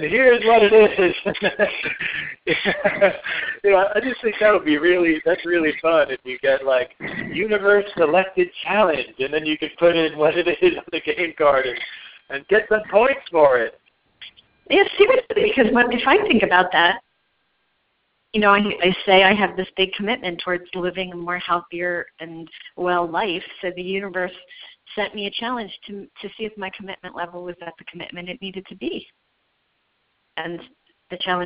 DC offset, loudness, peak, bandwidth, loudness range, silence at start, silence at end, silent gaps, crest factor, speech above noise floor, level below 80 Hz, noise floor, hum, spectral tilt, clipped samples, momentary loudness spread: under 0.1%; -19 LUFS; 0 dBFS; 5.2 kHz; 14 LU; 0 s; 0 s; none; 20 dB; 49 dB; -54 dBFS; -69 dBFS; none; -2 dB/octave; under 0.1%; 17 LU